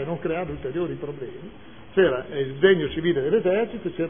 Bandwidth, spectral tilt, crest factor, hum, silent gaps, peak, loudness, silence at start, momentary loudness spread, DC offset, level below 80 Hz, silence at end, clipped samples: 3.6 kHz; -10.5 dB/octave; 18 dB; none; none; -6 dBFS; -24 LUFS; 0 s; 16 LU; 0.5%; -50 dBFS; 0 s; under 0.1%